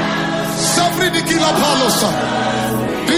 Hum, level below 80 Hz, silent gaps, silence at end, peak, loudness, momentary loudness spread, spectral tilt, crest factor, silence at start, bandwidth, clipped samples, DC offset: none; -44 dBFS; none; 0 s; -2 dBFS; -15 LUFS; 5 LU; -3.5 dB/octave; 14 dB; 0 s; 16 kHz; under 0.1%; under 0.1%